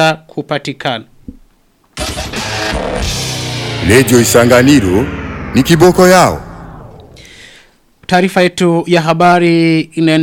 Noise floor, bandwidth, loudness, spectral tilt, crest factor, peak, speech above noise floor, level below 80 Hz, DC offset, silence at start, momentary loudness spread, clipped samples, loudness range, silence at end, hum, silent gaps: -52 dBFS; 18 kHz; -11 LUFS; -5 dB/octave; 12 dB; 0 dBFS; 42 dB; -32 dBFS; under 0.1%; 0 s; 15 LU; 0.1%; 10 LU; 0 s; none; none